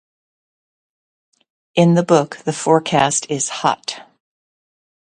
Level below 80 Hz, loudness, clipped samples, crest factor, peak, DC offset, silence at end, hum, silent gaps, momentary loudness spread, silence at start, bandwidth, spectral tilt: -60 dBFS; -17 LUFS; under 0.1%; 20 dB; 0 dBFS; under 0.1%; 1 s; none; none; 10 LU; 1.75 s; 10.5 kHz; -4.5 dB/octave